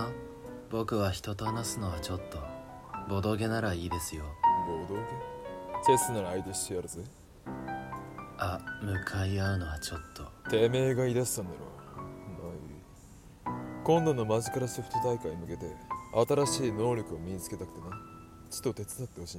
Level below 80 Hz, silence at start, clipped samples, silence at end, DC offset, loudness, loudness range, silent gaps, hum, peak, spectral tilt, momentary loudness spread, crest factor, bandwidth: -52 dBFS; 0 s; under 0.1%; 0 s; under 0.1%; -33 LUFS; 5 LU; none; none; -12 dBFS; -5 dB/octave; 17 LU; 20 dB; 16 kHz